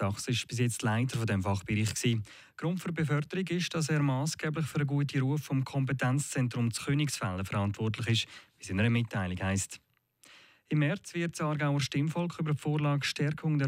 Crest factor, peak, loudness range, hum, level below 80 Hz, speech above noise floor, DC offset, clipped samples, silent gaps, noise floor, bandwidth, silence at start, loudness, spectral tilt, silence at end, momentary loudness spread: 16 dB; -16 dBFS; 2 LU; none; -66 dBFS; 31 dB; under 0.1%; under 0.1%; none; -62 dBFS; 16 kHz; 0 s; -31 LUFS; -5.5 dB/octave; 0 s; 5 LU